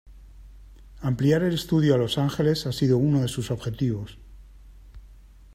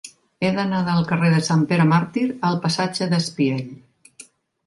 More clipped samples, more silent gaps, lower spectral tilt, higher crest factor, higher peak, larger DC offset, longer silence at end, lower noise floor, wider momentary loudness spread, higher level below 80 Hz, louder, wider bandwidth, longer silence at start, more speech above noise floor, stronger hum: neither; neither; about the same, -7 dB/octave vs -6 dB/octave; about the same, 18 dB vs 16 dB; second, -8 dBFS vs -4 dBFS; neither; about the same, 0.4 s vs 0.45 s; about the same, -48 dBFS vs -48 dBFS; first, 9 LU vs 6 LU; first, -46 dBFS vs -62 dBFS; second, -24 LUFS vs -20 LUFS; first, 15.5 kHz vs 11.5 kHz; about the same, 0.05 s vs 0.05 s; about the same, 25 dB vs 28 dB; neither